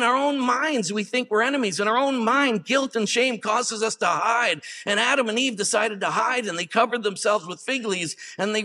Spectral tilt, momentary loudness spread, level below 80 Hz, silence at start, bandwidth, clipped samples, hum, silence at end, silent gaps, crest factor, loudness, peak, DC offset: -2.5 dB/octave; 5 LU; -82 dBFS; 0 s; 13 kHz; under 0.1%; none; 0 s; none; 18 dB; -23 LUFS; -6 dBFS; under 0.1%